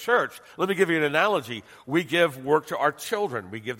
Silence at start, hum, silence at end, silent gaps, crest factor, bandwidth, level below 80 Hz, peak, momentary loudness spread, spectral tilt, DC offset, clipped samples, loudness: 0 s; none; 0 s; none; 18 dB; 16.5 kHz; -70 dBFS; -6 dBFS; 10 LU; -4.5 dB/octave; under 0.1%; under 0.1%; -25 LUFS